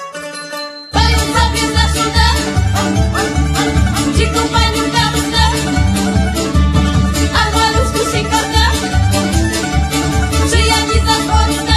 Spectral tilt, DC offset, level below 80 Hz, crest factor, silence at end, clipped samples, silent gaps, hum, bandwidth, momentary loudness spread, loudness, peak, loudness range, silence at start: -4.5 dB/octave; under 0.1%; -18 dBFS; 12 dB; 0 s; under 0.1%; none; none; 14 kHz; 3 LU; -13 LUFS; 0 dBFS; 1 LU; 0 s